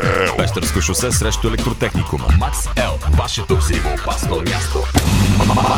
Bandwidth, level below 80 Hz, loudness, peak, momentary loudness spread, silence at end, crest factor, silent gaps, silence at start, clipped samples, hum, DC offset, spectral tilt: 17.5 kHz; -22 dBFS; -17 LUFS; 0 dBFS; 5 LU; 0 s; 16 dB; none; 0 s; under 0.1%; none; under 0.1%; -4.5 dB/octave